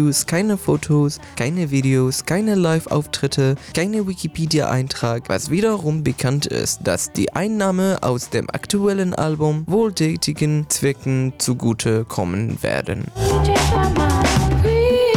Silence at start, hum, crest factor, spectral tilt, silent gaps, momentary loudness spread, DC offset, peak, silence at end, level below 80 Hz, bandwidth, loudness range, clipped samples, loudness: 0 s; none; 10 dB; -5 dB/octave; none; 6 LU; under 0.1%; -8 dBFS; 0 s; -32 dBFS; 19.5 kHz; 2 LU; under 0.1%; -19 LUFS